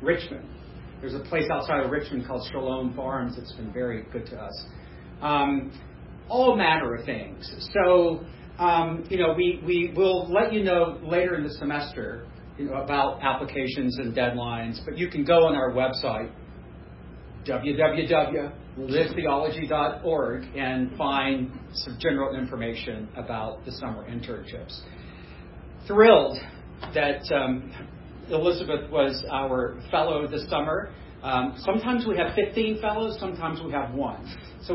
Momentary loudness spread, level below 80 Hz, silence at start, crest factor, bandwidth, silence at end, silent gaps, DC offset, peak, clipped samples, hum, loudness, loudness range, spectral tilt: 19 LU; -46 dBFS; 0 s; 24 dB; 5.8 kHz; 0 s; none; under 0.1%; -2 dBFS; under 0.1%; none; -26 LUFS; 7 LU; -10 dB/octave